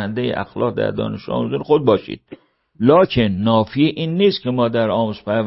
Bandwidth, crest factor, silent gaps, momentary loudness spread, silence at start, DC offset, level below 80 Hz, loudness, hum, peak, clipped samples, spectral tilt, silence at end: 5.8 kHz; 16 dB; none; 9 LU; 0 s; under 0.1%; -48 dBFS; -18 LUFS; none; 0 dBFS; under 0.1%; -11 dB/octave; 0 s